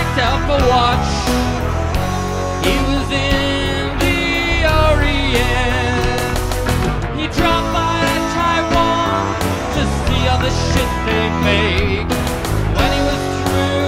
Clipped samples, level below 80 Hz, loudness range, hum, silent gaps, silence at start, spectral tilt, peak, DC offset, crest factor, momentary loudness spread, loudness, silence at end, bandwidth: under 0.1%; -22 dBFS; 1 LU; none; none; 0 s; -5 dB/octave; -2 dBFS; under 0.1%; 14 dB; 5 LU; -16 LUFS; 0 s; 16 kHz